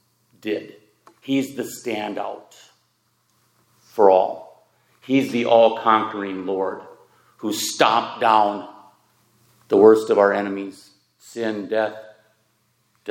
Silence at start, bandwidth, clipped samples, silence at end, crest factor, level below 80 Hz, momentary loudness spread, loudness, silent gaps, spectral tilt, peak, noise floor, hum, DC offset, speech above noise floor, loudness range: 0.45 s; 17 kHz; under 0.1%; 0 s; 22 dB; -78 dBFS; 19 LU; -20 LUFS; none; -4 dB/octave; 0 dBFS; -66 dBFS; none; under 0.1%; 47 dB; 10 LU